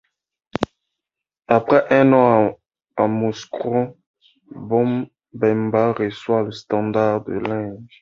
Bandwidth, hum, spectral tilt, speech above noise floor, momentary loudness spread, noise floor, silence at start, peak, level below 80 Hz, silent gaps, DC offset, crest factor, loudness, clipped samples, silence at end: 7.4 kHz; none; -7.5 dB/octave; 67 dB; 14 LU; -85 dBFS; 0.55 s; 0 dBFS; -56 dBFS; 4.07-4.14 s; under 0.1%; 20 dB; -19 LUFS; under 0.1%; 0.15 s